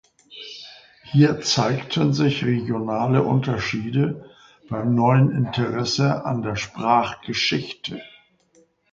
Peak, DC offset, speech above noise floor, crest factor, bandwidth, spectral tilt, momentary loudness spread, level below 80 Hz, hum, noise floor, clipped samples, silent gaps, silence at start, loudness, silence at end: -4 dBFS; under 0.1%; 39 dB; 18 dB; 7.6 kHz; -6 dB/octave; 16 LU; -54 dBFS; none; -60 dBFS; under 0.1%; none; 0.3 s; -21 LUFS; 0.85 s